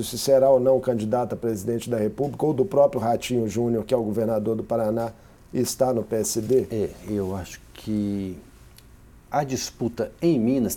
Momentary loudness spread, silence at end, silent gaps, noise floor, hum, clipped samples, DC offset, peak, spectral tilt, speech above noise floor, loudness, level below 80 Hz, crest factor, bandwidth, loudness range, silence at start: 10 LU; 0 s; none; -49 dBFS; none; under 0.1%; under 0.1%; -6 dBFS; -6 dB/octave; 26 dB; -24 LUFS; -52 dBFS; 18 dB; 18.5 kHz; 6 LU; 0 s